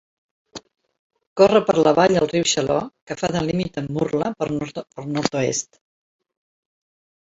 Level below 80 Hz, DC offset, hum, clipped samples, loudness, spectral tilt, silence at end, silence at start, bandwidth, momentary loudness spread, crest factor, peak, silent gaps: -54 dBFS; under 0.1%; none; under 0.1%; -20 LUFS; -4.5 dB/octave; 1.75 s; 0.55 s; 8 kHz; 18 LU; 20 dB; -2 dBFS; 0.99-1.10 s, 1.27-1.36 s, 3.02-3.07 s